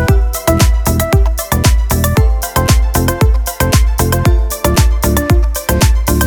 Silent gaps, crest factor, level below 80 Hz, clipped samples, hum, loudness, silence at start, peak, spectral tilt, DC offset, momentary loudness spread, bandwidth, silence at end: none; 10 dB; -14 dBFS; under 0.1%; none; -13 LUFS; 0 s; 0 dBFS; -5 dB/octave; under 0.1%; 2 LU; over 20 kHz; 0 s